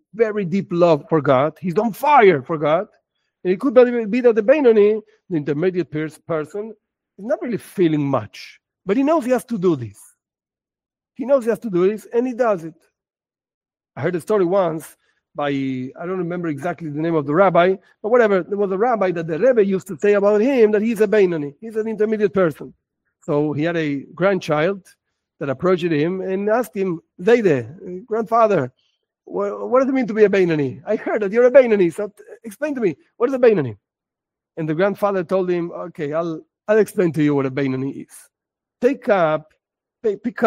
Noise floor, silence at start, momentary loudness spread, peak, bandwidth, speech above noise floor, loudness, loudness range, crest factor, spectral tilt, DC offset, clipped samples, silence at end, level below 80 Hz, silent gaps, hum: under -90 dBFS; 0.15 s; 13 LU; 0 dBFS; 16 kHz; over 72 dB; -19 LUFS; 6 LU; 18 dB; -7.5 dB/octave; under 0.1%; under 0.1%; 0 s; -64 dBFS; 13.54-13.61 s; none